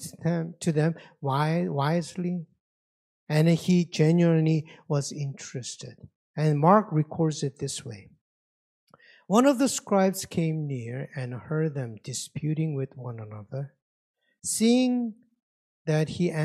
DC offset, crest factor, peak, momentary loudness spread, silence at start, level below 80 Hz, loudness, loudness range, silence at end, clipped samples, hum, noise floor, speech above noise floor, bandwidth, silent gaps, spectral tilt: under 0.1%; 22 dB; -6 dBFS; 15 LU; 0 s; -68 dBFS; -26 LUFS; 6 LU; 0 s; under 0.1%; none; under -90 dBFS; over 64 dB; 14 kHz; 2.60-3.27 s, 6.16-6.34 s, 8.21-8.87 s, 13.82-14.14 s, 15.43-15.85 s; -6 dB/octave